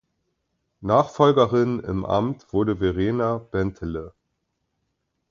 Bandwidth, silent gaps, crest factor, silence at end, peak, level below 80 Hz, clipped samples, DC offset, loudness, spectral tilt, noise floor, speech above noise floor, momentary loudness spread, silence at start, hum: 7.4 kHz; none; 22 dB; 1.2 s; -2 dBFS; -46 dBFS; under 0.1%; under 0.1%; -22 LUFS; -8 dB/octave; -76 dBFS; 54 dB; 13 LU; 0.8 s; none